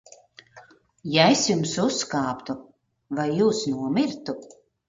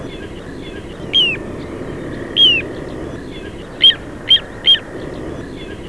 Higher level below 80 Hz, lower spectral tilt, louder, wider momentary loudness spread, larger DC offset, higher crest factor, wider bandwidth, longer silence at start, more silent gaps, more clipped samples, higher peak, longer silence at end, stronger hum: second, -64 dBFS vs -38 dBFS; about the same, -4 dB/octave vs -3.5 dB/octave; second, -23 LUFS vs -12 LUFS; second, 17 LU vs 20 LU; second, under 0.1% vs 0.6%; about the same, 22 dB vs 18 dB; second, 9.4 kHz vs 11 kHz; first, 0.55 s vs 0 s; neither; neither; about the same, -2 dBFS vs 0 dBFS; first, 0.4 s vs 0 s; neither